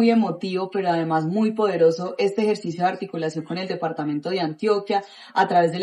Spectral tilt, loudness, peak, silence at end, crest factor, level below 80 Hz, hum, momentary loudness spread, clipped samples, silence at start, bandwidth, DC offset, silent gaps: -6.5 dB/octave; -23 LUFS; -6 dBFS; 0 s; 16 dB; -76 dBFS; none; 8 LU; under 0.1%; 0 s; 11 kHz; under 0.1%; none